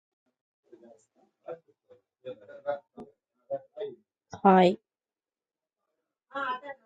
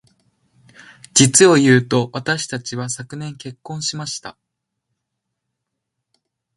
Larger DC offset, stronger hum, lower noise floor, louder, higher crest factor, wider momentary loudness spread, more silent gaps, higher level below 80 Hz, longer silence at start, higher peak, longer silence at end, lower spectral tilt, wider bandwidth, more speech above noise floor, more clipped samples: neither; neither; first, under -90 dBFS vs -78 dBFS; second, -27 LUFS vs -16 LUFS; first, 26 dB vs 20 dB; first, 27 LU vs 20 LU; neither; second, -76 dBFS vs -60 dBFS; first, 1.5 s vs 1.15 s; second, -6 dBFS vs 0 dBFS; second, 0.15 s vs 2.25 s; first, -7.5 dB/octave vs -4 dB/octave; second, 8 kHz vs 12 kHz; first, over 65 dB vs 61 dB; neither